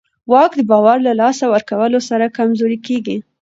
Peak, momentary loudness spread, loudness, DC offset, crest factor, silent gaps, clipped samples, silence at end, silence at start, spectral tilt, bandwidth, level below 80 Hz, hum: 0 dBFS; 8 LU; -14 LUFS; under 0.1%; 14 dB; none; under 0.1%; 0.2 s; 0.3 s; -5.5 dB/octave; 8 kHz; -64 dBFS; none